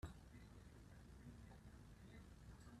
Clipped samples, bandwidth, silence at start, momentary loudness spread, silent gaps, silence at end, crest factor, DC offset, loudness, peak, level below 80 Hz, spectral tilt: under 0.1%; 13.5 kHz; 0 s; 2 LU; none; 0 s; 20 dB; under 0.1%; -63 LUFS; -40 dBFS; -64 dBFS; -6 dB/octave